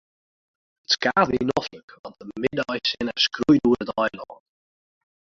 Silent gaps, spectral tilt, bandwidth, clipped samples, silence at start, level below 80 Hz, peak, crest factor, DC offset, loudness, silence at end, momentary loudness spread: 1.83-1.88 s, 1.99-2.04 s; -4.5 dB/octave; 7.6 kHz; under 0.1%; 0.9 s; -54 dBFS; -4 dBFS; 22 dB; under 0.1%; -22 LUFS; 1.05 s; 22 LU